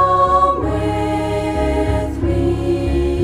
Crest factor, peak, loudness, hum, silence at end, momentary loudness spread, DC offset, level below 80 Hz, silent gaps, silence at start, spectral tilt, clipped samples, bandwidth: 14 dB; -4 dBFS; -17 LUFS; none; 0 s; 6 LU; under 0.1%; -24 dBFS; none; 0 s; -7.5 dB/octave; under 0.1%; 13.5 kHz